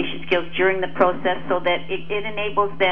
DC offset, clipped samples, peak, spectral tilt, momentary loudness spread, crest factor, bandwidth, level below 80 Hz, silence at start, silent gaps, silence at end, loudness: 4%; under 0.1%; -4 dBFS; -7 dB/octave; 6 LU; 20 dB; 5.8 kHz; -50 dBFS; 0 s; none; 0 s; -22 LUFS